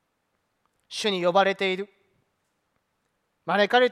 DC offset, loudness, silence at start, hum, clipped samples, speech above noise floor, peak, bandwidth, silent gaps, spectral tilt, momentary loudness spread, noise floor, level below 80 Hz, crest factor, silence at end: under 0.1%; -24 LUFS; 0.9 s; none; under 0.1%; 53 dB; -6 dBFS; 13.5 kHz; none; -4 dB/octave; 16 LU; -75 dBFS; -80 dBFS; 20 dB; 0 s